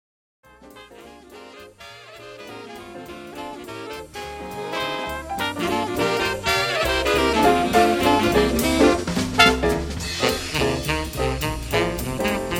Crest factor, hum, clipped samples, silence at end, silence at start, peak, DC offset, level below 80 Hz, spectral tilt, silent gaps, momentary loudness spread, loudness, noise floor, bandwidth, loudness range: 22 dB; none; under 0.1%; 0 s; 0.6 s; -2 dBFS; under 0.1%; -36 dBFS; -4 dB/octave; none; 20 LU; -21 LUFS; -45 dBFS; 17 kHz; 19 LU